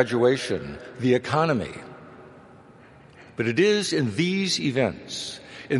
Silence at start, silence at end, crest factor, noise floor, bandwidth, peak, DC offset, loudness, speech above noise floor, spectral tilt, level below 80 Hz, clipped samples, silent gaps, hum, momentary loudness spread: 0 s; 0 s; 22 dB; -50 dBFS; 11.5 kHz; -4 dBFS; under 0.1%; -24 LUFS; 26 dB; -5 dB/octave; -58 dBFS; under 0.1%; none; none; 18 LU